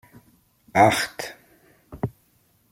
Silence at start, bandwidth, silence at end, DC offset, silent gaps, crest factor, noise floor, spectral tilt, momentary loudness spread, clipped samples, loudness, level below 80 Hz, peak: 0.75 s; 16.5 kHz; 0.6 s; under 0.1%; none; 24 dB; -63 dBFS; -4.5 dB/octave; 17 LU; under 0.1%; -22 LUFS; -56 dBFS; -2 dBFS